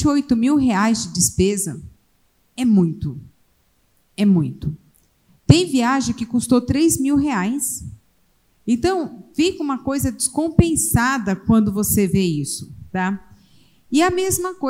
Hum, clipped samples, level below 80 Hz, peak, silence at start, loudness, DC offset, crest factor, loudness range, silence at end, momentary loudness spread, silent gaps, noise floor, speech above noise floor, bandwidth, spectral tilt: none; under 0.1%; -40 dBFS; 0 dBFS; 0 s; -19 LUFS; under 0.1%; 20 dB; 4 LU; 0 s; 13 LU; none; -61 dBFS; 43 dB; 16.5 kHz; -5 dB/octave